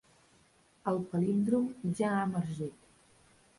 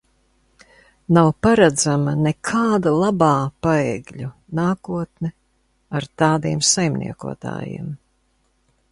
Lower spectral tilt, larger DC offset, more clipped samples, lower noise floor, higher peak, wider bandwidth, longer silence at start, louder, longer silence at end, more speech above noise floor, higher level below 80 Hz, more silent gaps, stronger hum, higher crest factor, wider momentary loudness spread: first, -8 dB/octave vs -5 dB/octave; neither; neither; about the same, -66 dBFS vs -64 dBFS; second, -16 dBFS vs 0 dBFS; about the same, 11.5 kHz vs 11.5 kHz; second, 0.85 s vs 1.1 s; second, -33 LUFS vs -19 LUFS; about the same, 0.9 s vs 0.95 s; second, 35 dB vs 46 dB; second, -68 dBFS vs -50 dBFS; neither; neither; about the same, 18 dB vs 20 dB; second, 10 LU vs 15 LU